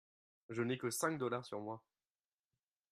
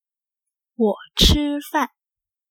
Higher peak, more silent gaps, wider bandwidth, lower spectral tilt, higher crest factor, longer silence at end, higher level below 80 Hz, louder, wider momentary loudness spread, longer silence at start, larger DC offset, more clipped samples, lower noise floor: second, -22 dBFS vs -2 dBFS; neither; second, 13.5 kHz vs over 20 kHz; about the same, -4.5 dB/octave vs -4 dB/octave; about the same, 22 dB vs 22 dB; first, 1.15 s vs 0.65 s; second, -84 dBFS vs -30 dBFS; second, -41 LUFS vs -20 LUFS; first, 11 LU vs 8 LU; second, 0.5 s vs 0.8 s; neither; neither; about the same, under -90 dBFS vs -89 dBFS